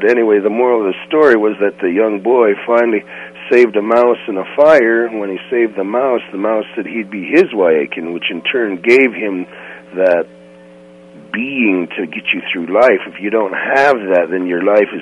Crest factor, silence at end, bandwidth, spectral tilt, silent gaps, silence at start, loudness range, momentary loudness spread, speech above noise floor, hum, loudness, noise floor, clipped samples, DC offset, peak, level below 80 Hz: 14 dB; 0 s; 8.6 kHz; -6 dB/octave; none; 0 s; 4 LU; 11 LU; 26 dB; none; -14 LUFS; -39 dBFS; under 0.1%; under 0.1%; 0 dBFS; -62 dBFS